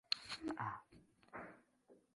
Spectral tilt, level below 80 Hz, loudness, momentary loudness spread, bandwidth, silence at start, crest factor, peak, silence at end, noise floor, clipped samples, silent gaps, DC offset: -3.5 dB/octave; -78 dBFS; -47 LUFS; 16 LU; 11.5 kHz; 0.1 s; 32 dB; -18 dBFS; 0.15 s; -71 dBFS; under 0.1%; none; under 0.1%